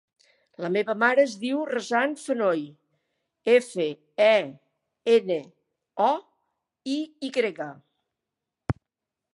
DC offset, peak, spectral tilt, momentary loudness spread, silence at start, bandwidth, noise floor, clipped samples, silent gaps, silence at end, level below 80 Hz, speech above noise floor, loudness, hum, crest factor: under 0.1%; -6 dBFS; -5 dB/octave; 16 LU; 0.6 s; 11.5 kHz; -86 dBFS; under 0.1%; none; 0.6 s; -56 dBFS; 62 dB; -25 LUFS; none; 20 dB